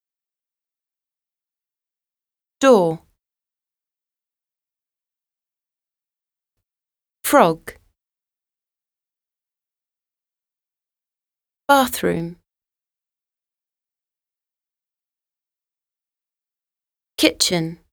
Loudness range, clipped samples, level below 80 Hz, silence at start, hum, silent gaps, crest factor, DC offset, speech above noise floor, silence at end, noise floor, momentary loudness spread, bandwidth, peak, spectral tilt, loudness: 5 LU; under 0.1%; -60 dBFS; 2.6 s; none; none; 26 dB; under 0.1%; over 73 dB; 0.15 s; under -90 dBFS; 18 LU; over 20 kHz; 0 dBFS; -4 dB/octave; -17 LUFS